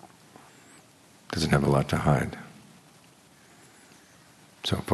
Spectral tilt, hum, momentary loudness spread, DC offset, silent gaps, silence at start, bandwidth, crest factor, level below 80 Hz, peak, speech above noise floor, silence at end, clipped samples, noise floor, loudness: -6 dB/octave; none; 15 LU; under 0.1%; none; 0.05 s; 13 kHz; 22 dB; -50 dBFS; -8 dBFS; 32 dB; 0 s; under 0.1%; -56 dBFS; -26 LUFS